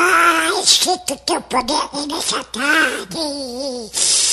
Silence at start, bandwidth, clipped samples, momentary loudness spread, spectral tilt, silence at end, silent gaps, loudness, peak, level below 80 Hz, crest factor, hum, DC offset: 0 s; 13 kHz; under 0.1%; 11 LU; 0 dB/octave; 0 s; none; -16 LUFS; 0 dBFS; -50 dBFS; 18 dB; none; under 0.1%